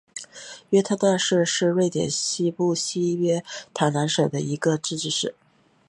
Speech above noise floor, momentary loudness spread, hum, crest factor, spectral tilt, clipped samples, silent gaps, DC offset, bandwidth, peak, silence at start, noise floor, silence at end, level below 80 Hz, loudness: 20 dB; 9 LU; none; 18 dB; -4.5 dB/octave; under 0.1%; none; under 0.1%; 11.5 kHz; -6 dBFS; 0.15 s; -42 dBFS; 0.55 s; -66 dBFS; -23 LUFS